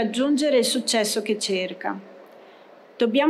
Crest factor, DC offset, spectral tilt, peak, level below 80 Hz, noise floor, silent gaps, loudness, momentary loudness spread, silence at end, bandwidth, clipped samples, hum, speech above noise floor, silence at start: 14 dB; under 0.1%; -3 dB/octave; -10 dBFS; -74 dBFS; -49 dBFS; none; -23 LUFS; 11 LU; 0 s; 15 kHz; under 0.1%; none; 27 dB; 0 s